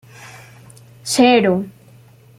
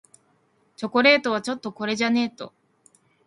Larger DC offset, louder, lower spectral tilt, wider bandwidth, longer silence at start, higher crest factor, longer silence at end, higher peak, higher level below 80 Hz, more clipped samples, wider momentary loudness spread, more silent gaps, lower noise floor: neither; first, -15 LUFS vs -22 LUFS; about the same, -4.5 dB/octave vs -4 dB/octave; first, 15.5 kHz vs 11.5 kHz; second, 0.2 s vs 0.8 s; about the same, 18 dB vs 22 dB; about the same, 0.7 s vs 0.8 s; about the same, -2 dBFS vs -4 dBFS; first, -58 dBFS vs -72 dBFS; neither; first, 26 LU vs 18 LU; neither; second, -46 dBFS vs -65 dBFS